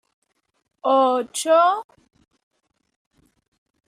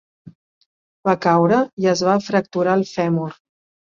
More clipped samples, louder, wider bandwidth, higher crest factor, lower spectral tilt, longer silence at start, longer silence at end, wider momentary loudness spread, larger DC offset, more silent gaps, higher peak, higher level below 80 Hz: neither; about the same, -19 LUFS vs -18 LUFS; first, 13.5 kHz vs 7.4 kHz; about the same, 18 dB vs 18 dB; second, -1.5 dB/octave vs -6 dB/octave; first, 0.85 s vs 0.25 s; first, 2.05 s vs 0.6 s; first, 10 LU vs 7 LU; neither; second, none vs 0.35-1.03 s, 1.73-1.77 s; second, -6 dBFS vs -2 dBFS; second, -76 dBFS vs -62 dBFS